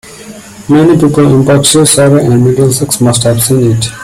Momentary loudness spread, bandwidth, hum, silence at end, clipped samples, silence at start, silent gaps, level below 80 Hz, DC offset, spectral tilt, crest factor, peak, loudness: 4 LU; 16 kHz; none; 0 s; 0.2%; 0.05 s; none; -38 dBFS; under 0.1%; -5 dB/octave; 8 dB; 0 dBFS; -7 LUFS